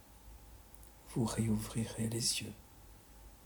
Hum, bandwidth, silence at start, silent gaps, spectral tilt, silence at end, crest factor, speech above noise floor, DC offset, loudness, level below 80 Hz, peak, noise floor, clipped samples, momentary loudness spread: none; over 20 kHz; 0 s; none; -4 dB/octave; 0 s; 20 dB; 21 dB; under 0.1%; -36 LUFS; -56 dBFS; -20 dBFS; -58 dBFS; under 0.1%; 23 LU